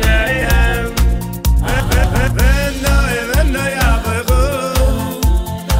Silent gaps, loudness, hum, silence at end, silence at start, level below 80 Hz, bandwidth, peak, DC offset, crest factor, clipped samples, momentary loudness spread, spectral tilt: none; -15 LUFS; none; 0 s; 0 s; -16 dBFS; 16.5 kHz; -2 dBFS; under 0.1%; 10 dB; under 0.1%; 3 LU; -5 dB/octave